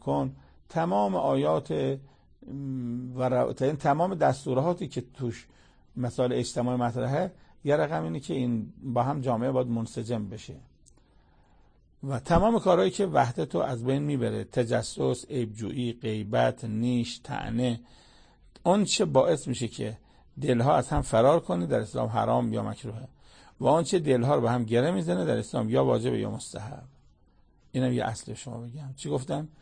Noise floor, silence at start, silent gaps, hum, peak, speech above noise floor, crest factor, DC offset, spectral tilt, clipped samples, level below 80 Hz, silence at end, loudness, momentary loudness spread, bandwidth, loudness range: -61 dBFS; 0.05 s; none; none; -8 dBFS; 34 dB; 20 dB; under 0.1%; -6.5 dB/octave; under 0.1%; -50 dBFS; 0.15 s; -28 LUFS; 13 LU; 9.8 kHz; 5 LU